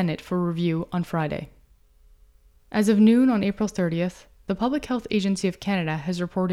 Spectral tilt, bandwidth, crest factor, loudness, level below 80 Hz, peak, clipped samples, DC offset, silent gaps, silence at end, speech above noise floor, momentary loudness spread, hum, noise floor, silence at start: -6.5 dB/octave; 13 kHz; 16 dB; -24 LUFS; -52 dBFS; -8 dBFS; under 0.1%; under 0.1%; none; 0 s; 33 dB; 12 LU; none; -56 dBFS; 0 s